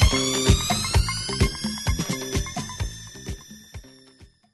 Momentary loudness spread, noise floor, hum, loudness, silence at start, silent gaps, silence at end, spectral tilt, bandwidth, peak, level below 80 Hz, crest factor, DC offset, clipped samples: 20 LU; -53 dBFS; none; -24 LUFS; 0 s; none; 0.3 s; -4 dB/octave; 12.5 kHz; -4 dBFS; -30 dBFS; 20 dB; under 0.1%; under 0.1%